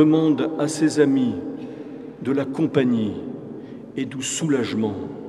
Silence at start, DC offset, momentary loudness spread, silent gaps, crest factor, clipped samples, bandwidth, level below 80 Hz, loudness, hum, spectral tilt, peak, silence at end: 0 s; under 0.1%; 16 LU; none; 18 dB; under 0.1%; 12 kHz; -64 dBFS; -22 LUFS; none; -5.5 dB/octave; -4 dBFS; 0 s